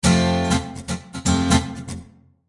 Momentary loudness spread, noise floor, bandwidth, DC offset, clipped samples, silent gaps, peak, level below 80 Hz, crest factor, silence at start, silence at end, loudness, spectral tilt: 16 LU; -44 dBFS; 11.5 kHz; under 0.1%; under 0.1%; none; -4 dBFS; -40 dBFS; 18 dB; 0.05 s; 0.45 s; -21 LUFS; -5 dB/octave